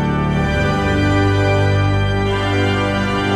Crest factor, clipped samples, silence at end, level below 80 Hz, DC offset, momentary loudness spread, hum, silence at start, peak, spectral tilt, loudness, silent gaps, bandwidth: 10 dB; under 0.1%; 0 s; -30 dBFS; under 0.1%; 3 LU; 50 Hz at -30 dBFS; 0 s; -4 dBFS; -6.5 dB/octave; -16 LUFS; none; 10 kHz